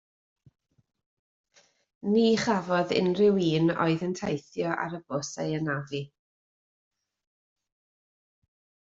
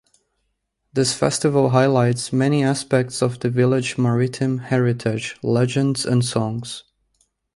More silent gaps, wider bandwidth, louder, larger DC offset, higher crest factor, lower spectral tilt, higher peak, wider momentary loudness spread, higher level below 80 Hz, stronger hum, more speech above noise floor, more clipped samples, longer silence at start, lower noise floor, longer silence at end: neither; second, 7.8 kHz vs 11.5 kHz; second, -27 LUFS vs -20 LUFS; neither; about the same, 18 dB vs 18 dB; about the same, -6 dB/octave vs -5.5 dB/octave; second, -10 dBFS vs -2 dBFS; first, 11 LU vs 8 LU; second, -66 dBFS vs -56 dBFS; neither; first, over 64 dB vs 54 dB; neither; first, 2.05 s vs 0.95 s; first, under -90 dBFS vs -73 dBFS; first, 2.8 s vs 0.75 s